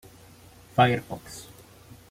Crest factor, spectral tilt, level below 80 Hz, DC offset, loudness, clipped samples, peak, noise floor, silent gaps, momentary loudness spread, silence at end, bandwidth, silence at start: 22 dB; -5.5 dB/octave; -58 dBFS; under 0.1%; -24 LUFS; under 0.1%; -6 dBFS; -51 dBFS; none; 21 LU; 0.7 s; 16 kHz; 0.75 s